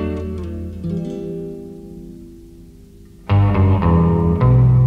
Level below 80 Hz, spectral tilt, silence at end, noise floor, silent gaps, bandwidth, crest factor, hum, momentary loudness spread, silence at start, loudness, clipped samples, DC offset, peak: -30 dBFS; -10.5 dB/octave; 0 s; -42 dBFS; none; 4.7 kHz; 14 dB; 50 Hz at -35 dBFS; 22 LU; 0 s; -17 LUFS; under 0.1%; under 0.1%; -4 dBFS